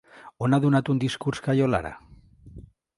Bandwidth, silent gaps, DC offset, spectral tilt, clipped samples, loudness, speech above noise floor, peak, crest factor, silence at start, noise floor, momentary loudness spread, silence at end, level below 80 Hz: 11.5 kHz; none; under 0.1%; -7 dB/octave; under 0.1%; -24 LUFS; 25 dB; -8 dBFS; 18 dB; 0.15 s; -48 dBFS; 8 LU; 0.35 s; -52 dBFS